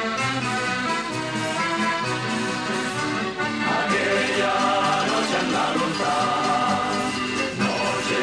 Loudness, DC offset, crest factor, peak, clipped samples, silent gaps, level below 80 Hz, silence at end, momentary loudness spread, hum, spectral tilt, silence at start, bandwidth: -23 LUFS; under 0.1%; 12 dB; -10 dBFS; under 0.1%; none; -56 dBFS; 0 s; 4 LU; none; -3.5 dB/octave; 0 s; 11 kHz